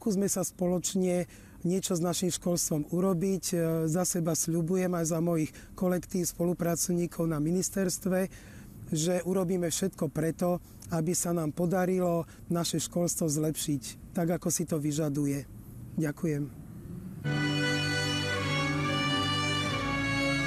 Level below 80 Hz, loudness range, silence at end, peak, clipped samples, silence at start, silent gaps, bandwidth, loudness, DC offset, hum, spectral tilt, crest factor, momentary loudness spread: -54 dBFS; 3 LU; 0 s; -16 dBFS; under 0.1%; 0 s; none; 15 kHz; -30 LUFS; under 0.1%; none; -4.5 dB/octave; 14 dB; 7 LU